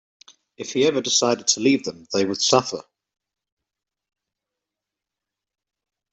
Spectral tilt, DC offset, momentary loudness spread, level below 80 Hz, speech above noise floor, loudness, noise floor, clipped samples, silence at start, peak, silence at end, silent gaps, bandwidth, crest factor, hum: -2.5 dB/octave; under 0.1%; 12 LU; -68 dBFS; 65 dB; -20 LUFS; -86 dBFS; under 0.1%; 0.6 s; -2 dBFS; 3.3 s; none; 8.4 kHz; 22 dB; none